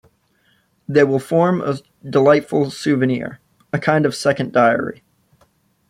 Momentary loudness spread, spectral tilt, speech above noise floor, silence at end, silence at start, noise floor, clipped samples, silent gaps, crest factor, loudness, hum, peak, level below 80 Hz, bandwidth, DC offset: 12 LU; -6.5 dB/octave; 44 dB; 0.95 s; 0.9 s; -61 dBFS; under 0.1%; none; 16 dB; -17 LUFS; none; -2 dBFS; -60 dBFS; 14.5 kHz; under 0.1%